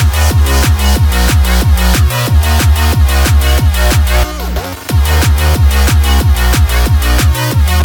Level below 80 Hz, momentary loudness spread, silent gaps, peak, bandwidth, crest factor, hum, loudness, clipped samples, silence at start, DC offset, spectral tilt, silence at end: -10 dBFS; 3 LU; none; 0 dBFS; 19.5 kHz; 8 dB; none; -11 LUFS; under 0.1%; 0 s; under 0.1%; -4.5 dB/octave; 0 s